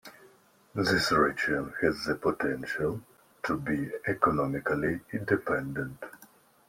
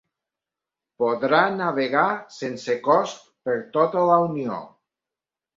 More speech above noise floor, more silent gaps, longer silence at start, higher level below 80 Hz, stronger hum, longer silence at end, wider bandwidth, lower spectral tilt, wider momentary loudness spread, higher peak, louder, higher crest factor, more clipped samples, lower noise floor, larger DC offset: second, 31 dB vs 68 dB; neither; second, 0.05 s vs 1 s; first, -56 dBFS vs -70 dBFS; neither; second, 0.45 s vs 0.9 s; first, 16.5 kHz vs 7.6 kHz; about the same, -5.5 dB/octave vs -5.5 dB/octave; about the same, 12 LU vs 12 LU; second, -8 dBFS vs -4 dBFS; second, -29 LUFS vs -22 LUFS; about the same, 22 dB vs 20 dB; neither; second, -60 dBFS vs -89 dBFS; neither